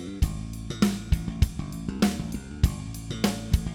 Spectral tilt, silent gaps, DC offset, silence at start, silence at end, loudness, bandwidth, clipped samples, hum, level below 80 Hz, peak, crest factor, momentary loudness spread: -6 dB/octave; none; under 0.1%; 0 s; 0 s; -29 LUFS; 19 kHz; under 0.1%; none; -32 dBFS; -8 dBFS; 20 dB; 9 LU